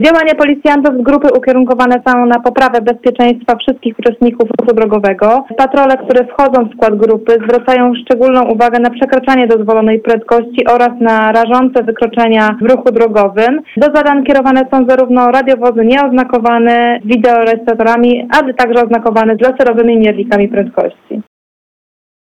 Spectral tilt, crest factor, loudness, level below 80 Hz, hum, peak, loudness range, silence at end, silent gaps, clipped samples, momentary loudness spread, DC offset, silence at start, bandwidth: -6.5 dB/octave; 8 dB; -9 LUFS; -44 dBFS; none; 0 dBFS; 2 LU; 1.05 s; none; under 0.1%; 3 LU; under 0.1%; 0 s; 9.2 kHz